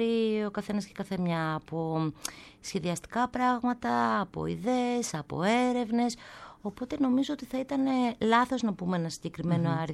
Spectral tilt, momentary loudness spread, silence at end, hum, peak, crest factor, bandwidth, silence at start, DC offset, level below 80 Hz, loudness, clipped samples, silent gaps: -5.5 dB/octave; 10 LU; 0 s; none; -12 dBFS; 18 dB; 13.5 kHz; 0 s; under 0.1%; -60 dBFS; -30 LUFS; under 0.1%; none